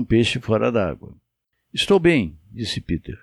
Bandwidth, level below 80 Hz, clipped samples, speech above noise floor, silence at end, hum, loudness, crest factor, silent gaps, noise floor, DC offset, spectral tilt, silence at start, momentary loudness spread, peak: 12.5 kHz; -42 dBFS; under 0.1%; 55 dB; 0.05 s; none; -21 LUFS; 16 dB; none; -75 dBFS; under 0.1%; -5.5 dB/octave; 0 s; 14 LU; -4 dBFS